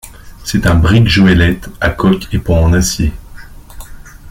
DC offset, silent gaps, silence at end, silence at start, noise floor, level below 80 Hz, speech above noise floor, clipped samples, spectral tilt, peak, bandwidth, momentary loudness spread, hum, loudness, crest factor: under 0.1%; none; 0 s; 0.05 s; -31 dBFS; -24 dBFS; 21 dB; under 0.1%; -5.5 dB/octave; 0 dBFS; 16 kHz; 9 LU; none; -12 LUFS; 12 dB